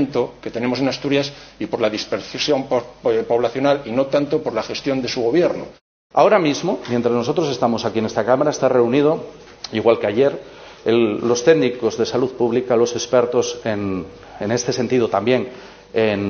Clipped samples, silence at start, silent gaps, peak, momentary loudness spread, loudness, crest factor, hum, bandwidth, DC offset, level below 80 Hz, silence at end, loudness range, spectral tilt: under 0.1%; 0 s; 5.81-6.10 s; 0 dBFS; 10 LU; -19 LUFS; 18 dB; none; 6.8 kHz; under 0.1%; -54 dBFS; 0 s; 2 LU; -4.5 dB/octave